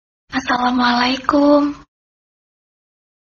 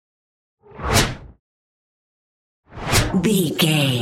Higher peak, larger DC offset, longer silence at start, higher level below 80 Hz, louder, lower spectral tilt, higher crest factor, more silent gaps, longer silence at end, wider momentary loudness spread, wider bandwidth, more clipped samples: about the same, 0 dBFS vs -2 dBFS; neither; second, 0.3 s vs 0.75 s; second, -50 dBFS vs -36 dBFS; first, -16 LUFS vs -19 LUFS; about the same, -4 dB/octave vs -4 dB/octave; about the same, 18 dB vs 20 dB; second, none vs 1.39-2.63 s; first, 1.5 s vs 0 s; second, 11 LU vs 14 LU; second, 7.2 kHz vs 16.5 kHz; neither